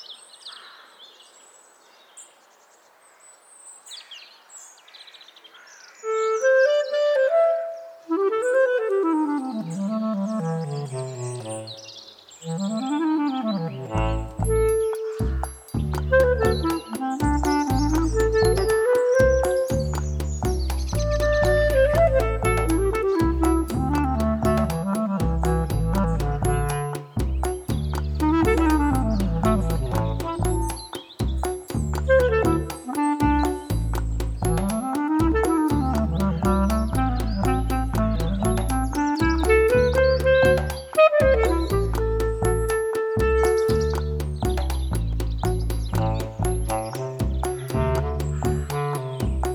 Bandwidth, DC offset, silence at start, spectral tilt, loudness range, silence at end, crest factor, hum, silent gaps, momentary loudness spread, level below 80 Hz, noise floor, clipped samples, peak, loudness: 18 kHz; under 0.1%; 0 s; -6.5 dB/octave; 6 LU; 0 s; 18 dB; none; none; 11 LU; -30 dBFS; -55 dBFS; under 0.1%; -6 dBFS; -23 LUFS